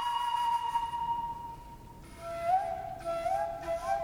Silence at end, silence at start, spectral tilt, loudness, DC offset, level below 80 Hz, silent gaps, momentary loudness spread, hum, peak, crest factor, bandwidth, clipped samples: 0 s; 0 s; -4 dB/octave; -33 LUFS; under 0.1%; -54 dBFS; none; 16 LU; none; -18 dBFS; 16 dB; 19.5 kHz; under 0.1%